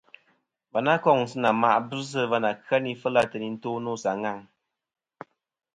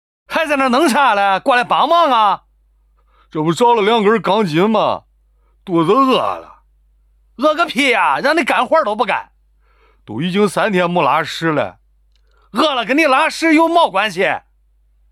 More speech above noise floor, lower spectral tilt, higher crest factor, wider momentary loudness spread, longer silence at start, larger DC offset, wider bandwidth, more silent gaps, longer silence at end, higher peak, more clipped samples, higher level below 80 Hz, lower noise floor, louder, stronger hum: first, 45 dB vs 41 dB; about the same, -5.5 dB/octave vs -5 dB/octave; first, 20 dB vs 14 dB; about the same, 10 LU vs 9 LU; first, 0.75 s vs 0.3 s; neither; second, 11.5 kHz vs 14 kHz; neither; first, 1.35 s vs 0.75 s; second, -6 dBFS vs -2 dBFS; neither; second, -70 dBFS vs -54 dBFS; first, -70 dBFS vs -55 dBFS; second, -25 LUFS vs -14 LUFS; neither